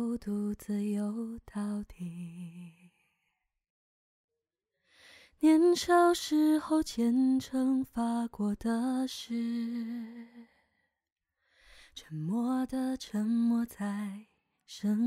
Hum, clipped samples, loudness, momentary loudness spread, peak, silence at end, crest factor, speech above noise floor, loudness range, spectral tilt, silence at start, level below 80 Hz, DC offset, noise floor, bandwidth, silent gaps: none; under 0.1%; -31 LUFS; 19 LU; -14 dBFS; 0 s; 18 dB; 57 dB; 14 LU; -5.5 dB/octave; 0 s; -62 dBFS; under 0.1%; -88 dBFS; 15.5 kHz; 3.70-4.28 s, 11.12-11.16 s